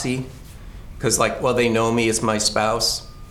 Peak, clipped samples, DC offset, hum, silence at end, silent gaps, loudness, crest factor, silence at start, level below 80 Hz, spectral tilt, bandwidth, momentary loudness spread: -4 dBFS; under 0.1%; under 0.1%; none; 0 s; none; -20 LUFS; 18 dB; 0 s; -40 dBFS; -3.5 dB/octave; 18.5 kHz; 10 LU